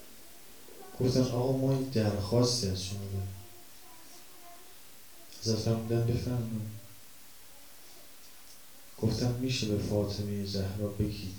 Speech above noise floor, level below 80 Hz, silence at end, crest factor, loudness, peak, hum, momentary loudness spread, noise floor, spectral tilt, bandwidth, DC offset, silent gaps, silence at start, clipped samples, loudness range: 24 dB; -54 dBFS; 0 s; 20 dB; -32 LUFS; -14 dBFS; none; 23 LU; -54 dBFS; -6 dB/octave; over 20 kHz; 0.3%; none; 0 s; under 0.1%; 7 LU